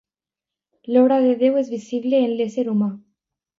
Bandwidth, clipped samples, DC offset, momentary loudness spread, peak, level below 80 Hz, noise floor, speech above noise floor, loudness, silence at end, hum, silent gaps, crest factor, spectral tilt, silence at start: 7.6 kHz; under 0.1%; under 0.1%; 9 LU; -4 dBFS; -74 dBFS; -88 dBFS; 70 dB; -20 LUFS; 0.6 s; none; none; 16 dB; -7.5 dB/octave; 0.85 s